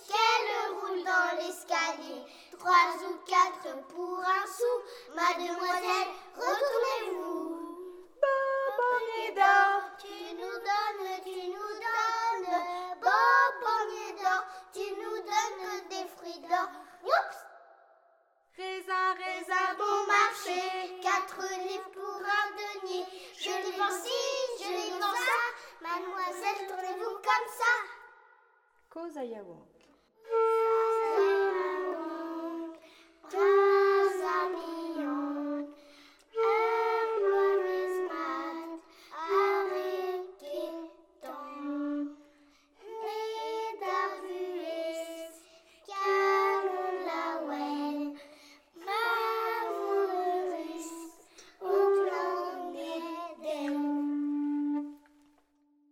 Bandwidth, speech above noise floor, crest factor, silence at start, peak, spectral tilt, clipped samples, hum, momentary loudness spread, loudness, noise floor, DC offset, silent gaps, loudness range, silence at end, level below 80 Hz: 17 kHz; 38 dB; 20 dB; 0 s; -10 dBFS; -1 dB/octave; under 0.1%; none; 15 LU; -31 LUFS; -69 dBFS; under 0.1%; none; 6 LU; 0.95 s; -80 dBFS